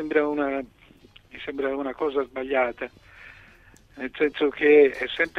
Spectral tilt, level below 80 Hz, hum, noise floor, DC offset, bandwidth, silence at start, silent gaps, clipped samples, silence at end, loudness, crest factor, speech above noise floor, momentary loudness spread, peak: -5.5 dB/octave; -58 dBFS; none; -53 dBFS; under 0.1%; 6.2 kHz; 0 s; none; under 0.1%; 0 s; -23 LUFS; 18 dB; 30 dB; 19 LU; -6 dBFS